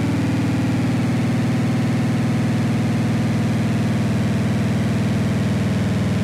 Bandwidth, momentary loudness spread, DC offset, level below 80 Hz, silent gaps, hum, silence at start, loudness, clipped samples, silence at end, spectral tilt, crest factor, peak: 14 kHz; 0 LU; under 0.1%; -44 dBFS; none; none; 0 s; -20 LUFS; under 0.1%; 0 s; -7 dB/octave; 8 dB; -10 dBFS